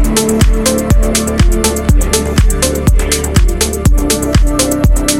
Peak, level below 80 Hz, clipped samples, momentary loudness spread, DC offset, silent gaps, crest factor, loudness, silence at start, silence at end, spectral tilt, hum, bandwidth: 0 dBFS; -12 dBFS; under 0.1%; 2 LU; under 0.1%; none; 10 dB; -12 LUFS; 0 s; 0 s; -4.5 dB/octave; none; 16.5 kHz